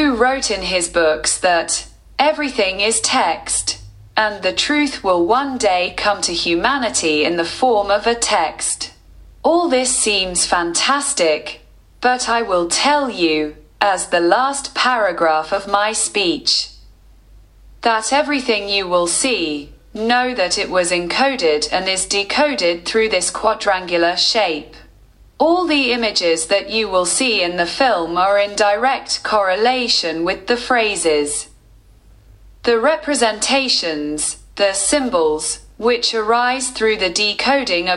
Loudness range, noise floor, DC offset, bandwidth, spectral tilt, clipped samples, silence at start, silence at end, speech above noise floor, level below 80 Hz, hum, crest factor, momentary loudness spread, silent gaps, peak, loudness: 2 LU; -47 dBFS; under 0.1%; 12 kHz; -1.5 dB/octave; under 0.1%; 0 s; 0 s; 30 dB; -46 dBFS; none; 18 dB; 6 LU; none; 0 dBFS; -16 LUFS